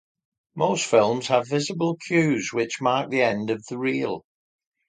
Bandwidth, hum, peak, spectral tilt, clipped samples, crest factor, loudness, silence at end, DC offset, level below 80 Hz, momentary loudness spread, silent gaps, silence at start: 9.6 kHz; none; -4 dBFS; -5 dB/octave; under 0.1%; 20 dB; -23 LUFS; 0.7 s; under 0.1%; -68 dBFS; 8 LU; none; 0.55 s